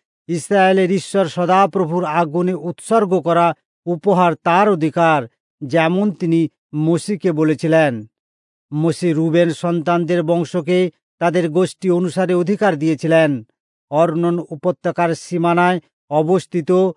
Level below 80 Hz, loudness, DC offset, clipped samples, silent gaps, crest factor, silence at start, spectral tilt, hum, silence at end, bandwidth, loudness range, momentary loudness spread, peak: -72 dBFS; -17 LUFS; under 0.1%; under 0.1%; 3.65-3.83 s, 5.40-5.58 s, 6.58-6.69 s, 8.19-8.69 s, 11.03-11.18 s, 13.60-13.88 s, 15.93-16.08 s; 14 dB; 0.3 s; -6.5 dB/octave; none; 0.05 s; 11 kHz; 2 LU; 7 LU; -2 dBFS